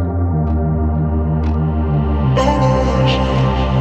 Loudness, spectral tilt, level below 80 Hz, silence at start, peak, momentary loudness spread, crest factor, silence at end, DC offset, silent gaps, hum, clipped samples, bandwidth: -16 LUFS; -7.5 dB/octave; -20 dBFS; 0 s; -2 dBFS; 3 LU; 12 dB; 0 s; under 0.1%; none; none; under 0.1%; 8 kHz